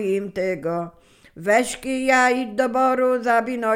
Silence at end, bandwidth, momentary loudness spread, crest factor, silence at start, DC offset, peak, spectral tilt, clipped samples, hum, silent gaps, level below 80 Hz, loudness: 0 s; 16 kHz; 10 LU; 16 dB; 0 s; under 0.1%; -4 dBFS; -4.5 dB/octave; under 0.1%; none; none; -56 dBFS; -21 LUFS